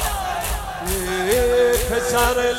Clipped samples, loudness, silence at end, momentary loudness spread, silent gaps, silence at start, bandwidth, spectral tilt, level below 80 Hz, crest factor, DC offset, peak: under 0.1%; -20 LUFS; 0 s; 8 LU; none; 0 s; 17 kHz; -3 dB/octave; -30 dBFS; 20 dB; under 0.1%; 0 dBFS